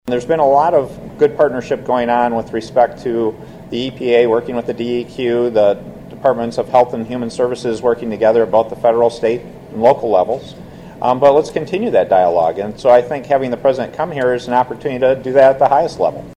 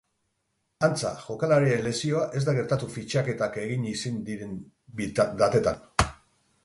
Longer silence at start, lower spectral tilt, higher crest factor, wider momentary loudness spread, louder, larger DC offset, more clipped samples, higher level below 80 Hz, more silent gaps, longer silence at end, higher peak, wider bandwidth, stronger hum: second, 0.05 s vs 0.8 s; about the same, -6.5 dB/octave vs -5.5 dB/octave; second, 14 dB vs 22 dB; about the same, 10 LU vs 12 LU; first, -15 LUFS vs -27 LUFS; neither; neither; about the same, -48 dBFS vs -46 dBFS; neither; second, 0.05 s vs 0.5 s; first, 0 dBFS vs -4 dBFS; about the same, 11.5 kHz vs 11.5 kHz; neither